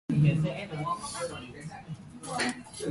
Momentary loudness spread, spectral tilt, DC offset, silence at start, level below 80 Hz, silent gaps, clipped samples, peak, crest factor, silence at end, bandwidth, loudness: 17 LU; -5.5 dB/octave; under 0.1%; 0.1 s; -58 dBFS; none; under 0.1%; -14 dBFS; 18 dB; 0 s; 11.5 kHz; -32 LUFS